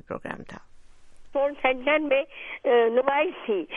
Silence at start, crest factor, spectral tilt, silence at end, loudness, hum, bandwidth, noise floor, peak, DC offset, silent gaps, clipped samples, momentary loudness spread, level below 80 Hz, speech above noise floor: 0.1 s; 18 dB; -6 dB/octave; 0 s; -25 LUFS; none; 6.4 kHz; -46 dBFS; -6 dBFS; under 0.1%; none; under 0.1%; 15 LU; -56 dBFS; 21 dB